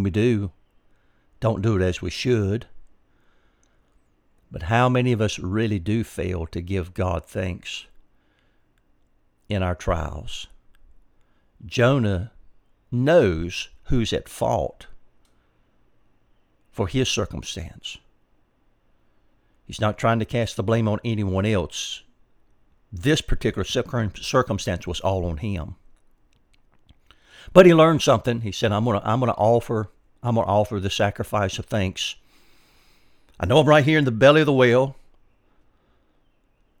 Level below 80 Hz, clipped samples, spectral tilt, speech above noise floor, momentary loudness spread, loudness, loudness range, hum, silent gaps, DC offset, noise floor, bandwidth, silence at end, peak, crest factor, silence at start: -42 dBFS; under 0.1%; -6 dB/octave; 41 dB; 16 LU; -22 LUFS; 11 LU; none; none; under 0.1%; -62 dBFS; 16.5 kHz; 1.85 s; 0 dBFS; 24 dB; 0 s